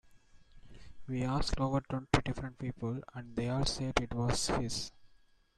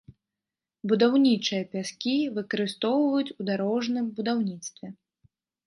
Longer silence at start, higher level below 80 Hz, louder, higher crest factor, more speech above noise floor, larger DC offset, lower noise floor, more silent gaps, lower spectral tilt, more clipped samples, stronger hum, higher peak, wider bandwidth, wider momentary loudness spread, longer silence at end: about the same, 0.1 s vs 0.1 s; first, -46 dBFS vs -74 dBFS; second, -35 LUFS vs -26 LUFS; first, 24 dB vs 18 dB; second, 31 dB vs 64 dB; neither; second, -65 dBFS vs -89 dBFS; neither; about the same, -5 dB/octave vs -5 dB/octave; neither; neither; about the same, -10 dBFS vs -10 dBFS; first, 13 kHz vs 11.5 kHz; second, 9 LU vs 14 LU; second, 0.45 s vs 0.75 s